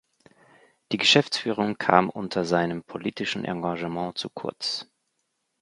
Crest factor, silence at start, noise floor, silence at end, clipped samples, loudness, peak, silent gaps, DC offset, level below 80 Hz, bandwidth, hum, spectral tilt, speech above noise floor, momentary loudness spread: 26 dB; 0.9 s; -76 dBFS; 0.8 s; under 0.1%; -25 LUFS; 0 dBFS; none; under 0.1%; -64 dBFS; 11.5 kHz; none; -4 dB/octave; 51 dB; 13 LU